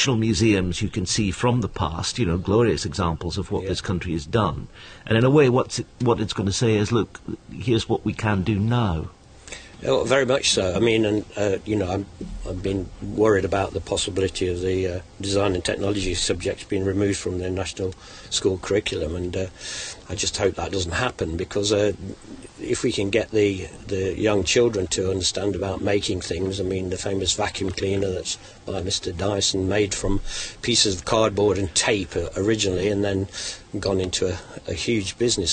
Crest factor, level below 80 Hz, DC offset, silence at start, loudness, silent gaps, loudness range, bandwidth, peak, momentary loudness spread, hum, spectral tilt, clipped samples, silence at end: 18 dB; -40 dBFS; under 0.1%; 0 s; -23 LUFS; none; 4 LU; 9.6 kHz; -4 dBFS; 11 LU; none; -4.5 dB/octave; under 0.1%; 0 s